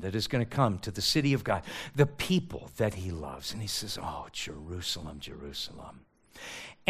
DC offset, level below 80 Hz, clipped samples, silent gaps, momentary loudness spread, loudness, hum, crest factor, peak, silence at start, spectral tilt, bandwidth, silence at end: under 0.1%; -54 dBFS; under 0.1%; none; 15 LU; -32 LUFS; none; 24 dB; -8 dBFS; 0 s; -5 dB/octave; 15.5 kHz; 0 s